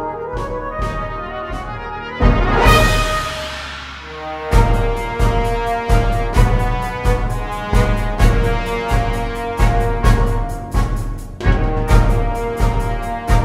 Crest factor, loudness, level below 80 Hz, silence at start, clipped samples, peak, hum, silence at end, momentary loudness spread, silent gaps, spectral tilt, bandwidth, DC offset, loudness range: 16 dB; -18 LUFS; -18 dBFS; 0 s; under 0.1%; 0 dBFS; none; 0 s; 11 LU; none; -6 dB/octave; 15 kHz; under 0.1%; 2 LU